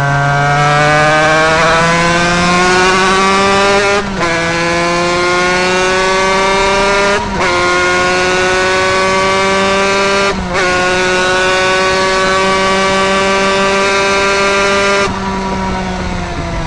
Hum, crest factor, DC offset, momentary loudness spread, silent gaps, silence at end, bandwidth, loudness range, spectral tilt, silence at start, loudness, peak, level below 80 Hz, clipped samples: none; 10 dB; under 0.1%; 4 LU; none; 0 s; 11 kHz; 2 LU; -3.5 dB/octave; 0 s; -10 LUFS; 0 dBFS; -30 dBFS; under 0.1%